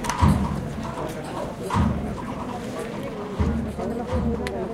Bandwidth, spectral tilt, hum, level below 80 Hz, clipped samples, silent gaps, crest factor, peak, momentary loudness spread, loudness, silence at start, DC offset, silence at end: 15.5 kHz; -6.5 dB/octave; none; -34 dBFS; under 0.1%; none; 20 dB; -6 dBFS; 10 LU; -27 LUFS; 0 s; under 0.1%; 0 s